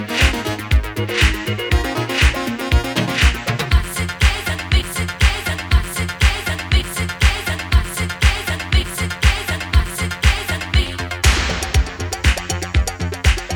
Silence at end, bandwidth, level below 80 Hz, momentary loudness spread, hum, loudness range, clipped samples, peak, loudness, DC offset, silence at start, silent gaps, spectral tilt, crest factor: 0 s; 19.5 kHz; -20 dBFS; 6 LU; none; 1 LU; under 0.1%; 0 dBFS; -18 LUFS; under 0.1%; 0 s; none; -4 dB/octave; 18 dB